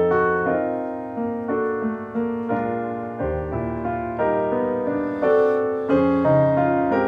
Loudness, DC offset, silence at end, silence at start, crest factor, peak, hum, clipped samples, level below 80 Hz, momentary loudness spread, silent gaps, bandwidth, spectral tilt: -22 LUFS; under 0.1%; 0 s; 0 s; 14 dB; -8 dBFS; none; under 0.1%; -46 dBFS; 9 LU; none; 5.2 kHz; -9.5 dB/octave